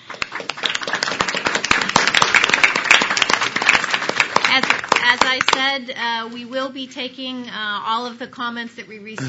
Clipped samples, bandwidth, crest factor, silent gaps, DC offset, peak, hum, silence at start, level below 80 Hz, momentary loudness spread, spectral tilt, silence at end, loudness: under 0.1%; 11 kHz; 20 dB; none; under 0.1%; 0 dBFS; none; 0.05 s; -54 dBFS; 14 LU; -1.5 dB/octave; 0 s; -17 LUFS